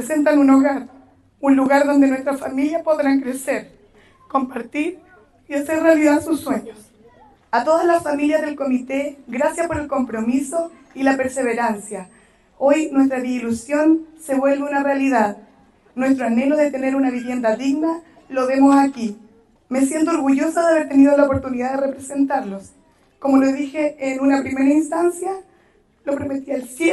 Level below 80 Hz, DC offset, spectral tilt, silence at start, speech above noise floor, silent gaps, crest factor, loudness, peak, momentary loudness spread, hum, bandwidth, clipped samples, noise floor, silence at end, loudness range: -56 dBFS; under 0.1%; -5 dB/octave; 0 s; 38 dB; none; 16 dB; -19 LUFS; -2 dBFS; 12 LU; none; 12.5 kHz; under 0.1%; -56 dBFS; 0 s; 4 LU